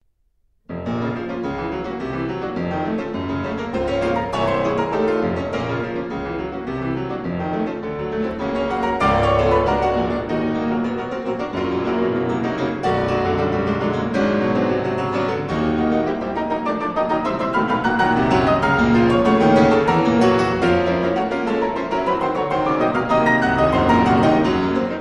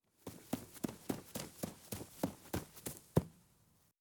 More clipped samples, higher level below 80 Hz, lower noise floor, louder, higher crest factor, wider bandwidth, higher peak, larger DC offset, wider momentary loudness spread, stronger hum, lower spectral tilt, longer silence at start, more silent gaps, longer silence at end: neither; first, -40 dBFS vs -62 dBFS; second, -63 dBFS vs -72 dBFS; first, -20 LUFS vs -43 LUFS; second, 16 dB vs 28 dB; second, 10.5 kHz vs over 20 kHz; first, -4 dBFS vs -16 dBFS; neither; about the same, 10 LU vs 10 LU; neither; first, -7 dB/octave vs -5.5 dB/octave; first, 0.7 s vs 0.25 s; neither; second, 0 s vs 0.6 s